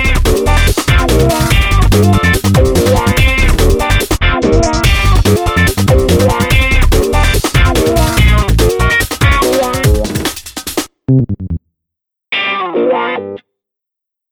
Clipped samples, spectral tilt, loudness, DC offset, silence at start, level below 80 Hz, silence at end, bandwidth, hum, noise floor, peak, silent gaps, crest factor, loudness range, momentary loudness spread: under 0.1%; -5 dB/octave; -11 LUFS; under 0.1%; 0 s; -14 dBFS; 0.95 s; over 20 kHz; none; -81 dBFS; 0 dBFS; none; 10 dB; 6 LU; 8 LU